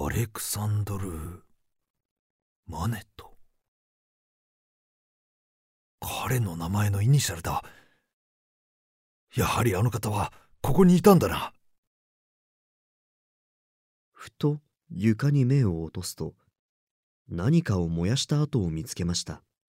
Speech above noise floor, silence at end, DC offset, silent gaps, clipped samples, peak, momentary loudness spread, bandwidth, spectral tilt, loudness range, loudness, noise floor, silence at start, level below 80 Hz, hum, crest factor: over 65 dB; 0.3 s; under 0.1%; 1.90-1.94 s, 2.05-2.63 s, 3.68-5.98 s, 8.13-9.27 s, 11.78-14.12 s, 16.59-17.25 s; under 0.1%; -4 dBFS; 15 LU; 16 kHz; -6 dB/octave; 16 LU; -26 LUFS; under -90 dBFS; 0 s; -48 dBFS; none; 24 dB